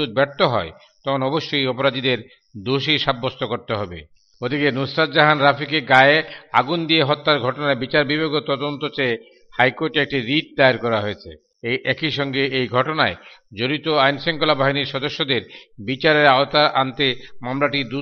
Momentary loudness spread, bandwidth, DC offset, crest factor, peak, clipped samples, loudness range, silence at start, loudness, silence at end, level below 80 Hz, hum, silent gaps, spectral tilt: 12 LU; 7.4 kHz; under 0.1%; 20 dB; 0 dBFS; under 0.1%; 5 LU; 0 s; -19 LUFS; 0 s; -56 dBFS; none; none; -6.5 dB/octave